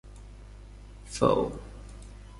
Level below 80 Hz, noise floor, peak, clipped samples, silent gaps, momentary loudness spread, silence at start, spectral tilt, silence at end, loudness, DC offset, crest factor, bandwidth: -46 dBFS; -46 dBFS; -10 dBFS; under 0.1%; none; 24 LU; 0.05 s; -6 dB/octave; 0 s; -28 LUFS; under 0.1%; 24 dB; 11.5 kHz